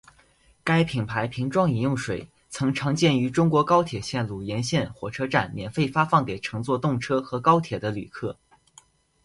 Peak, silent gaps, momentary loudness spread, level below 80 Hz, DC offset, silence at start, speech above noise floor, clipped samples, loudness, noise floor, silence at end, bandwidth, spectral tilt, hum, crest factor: -6 dBFS; none; 11 LU; -54 dBFS; under 0.1%; 0.65 s; 36 dB; under 0.1%; -25 LUFS; -60 dBFS; 0.9 s; 11.5 kHz; -6 dB/octave; none; 20 dB